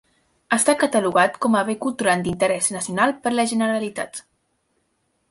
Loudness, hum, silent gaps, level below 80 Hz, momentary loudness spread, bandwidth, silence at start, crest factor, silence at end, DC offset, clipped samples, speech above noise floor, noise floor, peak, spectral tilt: -20 LUFS; none; none; -60 dBFS; 8 LU; 11.5 kHz; 0.5 s; 18 dB; 1.1 s; under 0.1%; under 0.1%; 49 dB; -70 dBFS; -4 dBFS; -3.5 dB/octave